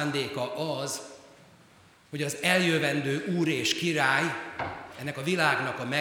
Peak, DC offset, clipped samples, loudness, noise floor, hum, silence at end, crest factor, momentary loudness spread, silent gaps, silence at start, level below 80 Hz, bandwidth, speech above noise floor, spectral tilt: -8 dBFS; under 0.1%; under 0.1%; -28 LUFS; -57 dBFS; none; 0 s; 22 dB; 13 LU; none; 0 s; -68 dBFS; 20 kHz; 29 dB; -4 dB/octave